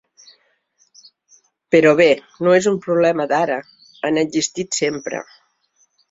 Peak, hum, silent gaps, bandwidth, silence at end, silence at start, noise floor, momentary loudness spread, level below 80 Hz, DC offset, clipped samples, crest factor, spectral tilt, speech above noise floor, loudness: -2 dBFS; none; none; 8 kHz; 0.9 s; 1.7 s; -63 dBFS; 13 LU; -62 dBFS; under 0.1%; under 0.1%; 18 dB; -4 dB/octave; 46 dB; -17 LUFS